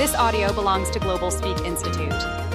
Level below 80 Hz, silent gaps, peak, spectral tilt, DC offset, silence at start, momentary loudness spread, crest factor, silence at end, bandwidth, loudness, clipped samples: -32 dBFS; none; -8 dBFS; -4 dB/octave; under 0.1%; 0 s; 5 LU; 14 dB; 0 s; 16 kHz; -23 LUFS; under 0.1%